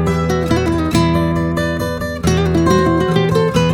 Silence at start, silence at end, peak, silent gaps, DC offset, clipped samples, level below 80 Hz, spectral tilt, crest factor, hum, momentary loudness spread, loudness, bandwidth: 0 s; 0 s; -2 dBFS; none; under 0.1%; under 0.1%; -30 dBFS; -6.5 dB/octave; 14 dB; none; 5 LU; -15 LUFS; 16 kHz